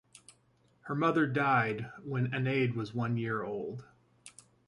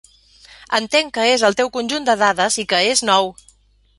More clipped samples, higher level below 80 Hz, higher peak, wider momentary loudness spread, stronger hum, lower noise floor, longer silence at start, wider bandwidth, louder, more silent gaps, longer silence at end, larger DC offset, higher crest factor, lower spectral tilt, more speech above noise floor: neither; second, -70 dBFS vs -56 dBFS; second, -16 dBFS vs -2 dBFS; first, 18 LU vs 6 LU; neither; first, -69 dBFS vs -54 dBFS; first, 0.85 s vs 0.7 s; about the same, 11.5 kHz vs 11.5 kHz; second, -32 LUFS vs -17 LUFS; neither; second, 0.4 s vs 0.65 s; neither; about the same, 18 dB vs 18 dB; first, -7 dB/octave vs -1.5 dB/octave; about the same, 37 dB vs 37 dB